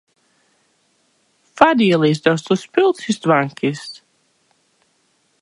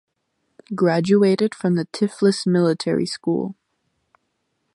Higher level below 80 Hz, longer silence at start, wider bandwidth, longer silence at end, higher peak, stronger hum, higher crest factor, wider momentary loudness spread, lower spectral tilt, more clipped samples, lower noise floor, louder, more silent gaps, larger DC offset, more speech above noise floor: about the same, -64 dBFS vs -66 dBFS; first, 1.55 s vs 0.7 s; about the same, 11.5 kHz vs 11.5 kHz; first, 1.5 s vs 1.2 s; first, 0 dBFS vs -6 dBFS; neither; about the same, 20 dB vs 16 dB; about the same, 10 LU vs 8 LU; about the same, -6 dB/octave vs -6.5 dB/octave; neither; second, -63 dBFS vs -73 dBFS; first, -16 LUFS vs -20 LUFS; neither; neither; second, 47 dB vs 54 dB